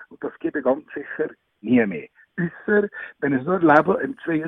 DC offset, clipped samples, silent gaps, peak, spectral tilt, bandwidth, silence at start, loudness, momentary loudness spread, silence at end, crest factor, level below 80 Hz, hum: under 0.1%; under 0.1%; none; 0 dBFS; -9.5 dB/octave; 5.8 kHz; 0 s; -22 LUFS; 17 LU; 0 s; 22 dB; -62 dBFS; none